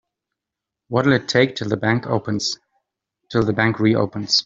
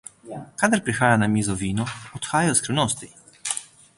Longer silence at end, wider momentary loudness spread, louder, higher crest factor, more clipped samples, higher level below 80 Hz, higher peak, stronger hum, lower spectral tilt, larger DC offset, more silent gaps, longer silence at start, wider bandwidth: second, 0.05 s vs 0.3 s; second, 7 LU vs 15 LU; first, -20 LUFS vs -23 LUFS; about the same, 18 dB vs 20 dB; neither; about the same, -54 dBFS vs -52 dBFS; about the same, -2 dBFS vs -4 dBFS; neither; about the same, -5 dB/octave vs -4 dB/octave; neither; neither; first, 0.9 s vs 0.25 s; second, 7.8 kHz vs 11.5 kHz